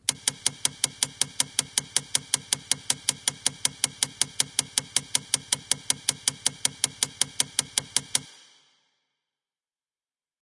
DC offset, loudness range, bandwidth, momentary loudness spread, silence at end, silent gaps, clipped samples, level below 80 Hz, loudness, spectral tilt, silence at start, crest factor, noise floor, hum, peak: under 0.1%; 3 LU; 11.5 kHz; 2 LU; 2.2 s; none; under 0.1%; -68 dBFS; -26 LUFS; 0.5 dB/octave; 0.1 s; 28 dB; under -90 dBFS; none; -2 dBFS